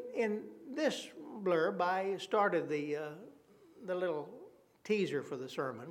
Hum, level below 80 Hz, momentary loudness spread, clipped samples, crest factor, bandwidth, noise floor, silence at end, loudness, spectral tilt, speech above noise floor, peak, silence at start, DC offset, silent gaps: none; -88 dBFS; 15 LU; under 0.1%; 18 dB; 15.5 kHz; -61 dBFS; 0 s; -36 LUFS; -5 dB/octave; 26 dB; -18 dBFS; 0 s; under 0.1%; none